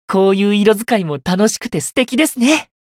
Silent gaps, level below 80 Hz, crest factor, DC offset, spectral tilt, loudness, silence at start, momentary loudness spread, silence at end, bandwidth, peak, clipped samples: none; -52 dBFS; 14 dB; under 0.1%; -4.5 dB/octave; -14 LUFS; 0.1 s; 6 LU; 0.2 s; 16.5 kHz; 0 dBFS; under 0.1%